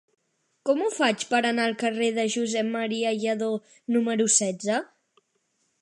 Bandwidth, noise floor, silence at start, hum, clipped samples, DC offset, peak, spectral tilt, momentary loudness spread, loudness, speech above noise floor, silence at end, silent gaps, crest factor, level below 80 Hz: 11.5 kHz; -73 dBFS; 0.65 s; none; under 0.1%; under 0.1%; -8 dBFS; -2.5 dB/octave; 7 LU; -25 LUFS; 48 dB; 0.95 s; none; 18 dB; -80 dBFS